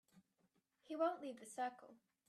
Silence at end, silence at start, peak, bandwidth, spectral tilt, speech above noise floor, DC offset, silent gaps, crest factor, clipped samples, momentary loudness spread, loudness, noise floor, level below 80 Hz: 0.35 s; 0.15 s; -28 dBFS; 13.5 kHz; -3.5 dB/octave; 38 dB; under 0.1%; none; 20 dB; under 0.1%; 11 LU; -45 LUFS; -82 dBFS; under -90 dBFS